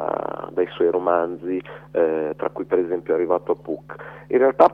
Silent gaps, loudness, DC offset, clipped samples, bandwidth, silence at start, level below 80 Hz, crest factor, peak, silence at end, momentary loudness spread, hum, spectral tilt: none; -23 LUFS; under 0.1%; under 0.1%; 5.4 kHz; 0 s; -60 dBFS; 20 dB; -2 dBFS; 0 s; 10 LU; none; -8.5 dB/octave